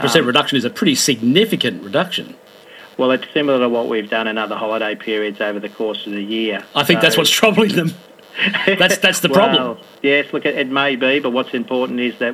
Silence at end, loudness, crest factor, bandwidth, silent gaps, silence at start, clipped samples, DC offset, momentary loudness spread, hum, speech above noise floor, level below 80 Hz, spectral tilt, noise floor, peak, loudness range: 0 s; -16 LUFS; 16 dB; 15.5 kHz; none; 0 s; under 0.1%; under 0.1%; 10 LU; none; 24 dB; -64 dBFS; -3.5 dB/octave; -41 dBFS; 0 dBFS; 5 LU